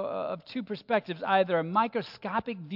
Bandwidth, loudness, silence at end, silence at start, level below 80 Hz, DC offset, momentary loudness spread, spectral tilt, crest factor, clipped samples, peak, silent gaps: 5.8 kHz; -30 LUFS; 0 s; 0 s; -72 dBFS; under 0.1%; 10 LU; -7.5 dB/octave; 18 dB; under 0.1%; -12 dBFS; none